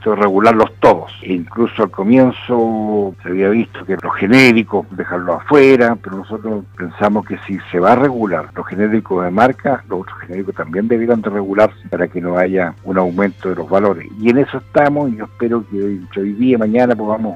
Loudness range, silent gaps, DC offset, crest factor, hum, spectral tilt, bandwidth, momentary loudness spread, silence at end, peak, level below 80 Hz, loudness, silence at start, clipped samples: 4 LU; none; under 0.1%; 14 dB; none; -7 dB/octave; 12.5 kHz; 12 LU; 0 s; 0 dBFS; -50 dBFS; -15 LUFS; 0 s; under 0.1%